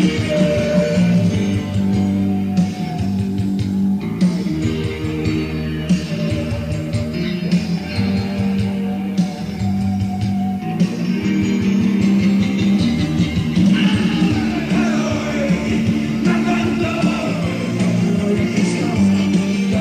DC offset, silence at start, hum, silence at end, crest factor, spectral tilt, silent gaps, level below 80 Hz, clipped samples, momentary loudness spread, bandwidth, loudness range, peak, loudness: under 0.1%; 0 s; none; 0 s; 14 dB; -7 dB/octave; none; -40 dBFS; under 0.1%; 6 LU; 10.5 kHz; 4 LU; -4 dBFS; -18 LUFS